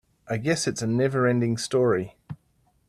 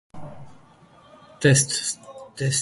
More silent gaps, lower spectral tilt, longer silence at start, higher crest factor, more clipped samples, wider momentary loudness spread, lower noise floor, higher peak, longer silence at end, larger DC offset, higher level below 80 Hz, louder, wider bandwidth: neither; first, -5.5 dB/octave vs -3.5 dB/octave; about the same, 0.25 s vs 0.15 s; second, 16 dB vs 22 dB; neither; second, 19 LU vs 25 LU; first, -66 dBFS vs -52 dBFS; second, -10 dBFS vs -4 dBFS; first, 0.55 s vs 0 s; neither; about the same, -60 dBFS vs -58 dBFS; second, -24 LUFS vs -21 LUFS; first, 13.5 kHz vs 11.5 kHz